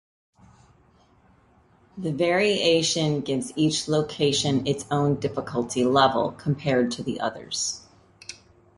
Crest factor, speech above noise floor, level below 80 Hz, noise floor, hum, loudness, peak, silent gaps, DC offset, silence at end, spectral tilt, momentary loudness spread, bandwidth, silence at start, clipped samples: 22 dB; 35 dB; -58 dBFS; -59 dBFS; none; -24 LUFS; -4 dBFS; none; under 0.1%; 0.45 s; -4.5 dB/octave; 11 LU; 11.5 kHz; 1.95 s; under 0.1%